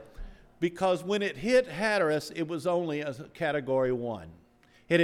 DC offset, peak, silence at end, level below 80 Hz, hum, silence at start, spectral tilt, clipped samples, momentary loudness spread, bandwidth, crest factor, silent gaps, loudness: under 0.1%; -12 dBFS; 0 s; -54 dBFS; none; 0 s; -5.5 dB/octave; under 0.1%; 9 LU; 14 kHz; 18 dB; none; -29 LUFS